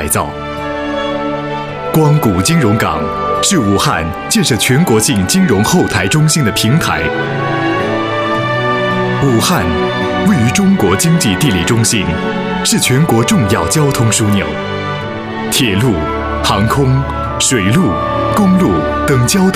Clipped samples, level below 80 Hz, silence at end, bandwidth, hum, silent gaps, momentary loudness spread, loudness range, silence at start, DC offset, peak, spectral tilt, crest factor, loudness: under 0.1%; -32 dBFS; 0 s; 15.5 kHz; none; none; 7 LU; 2 LU; 0 s; under 0.1%; 0 dBFS; -4.5 dB/octave; 12 dB; -12 LUFS